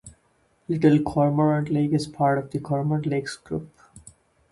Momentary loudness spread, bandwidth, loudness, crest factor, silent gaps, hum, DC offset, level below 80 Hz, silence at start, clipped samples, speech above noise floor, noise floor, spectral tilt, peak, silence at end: 12 LU; 11.5 kHz; -23 LUFS; 18 dB; none; none; under 0.1%; -56 dBFS; 0.05 s; under 0.1%; 42 dB; -65 dBFS; -7.5 dB/octave; -6 dBFS; 0.4 s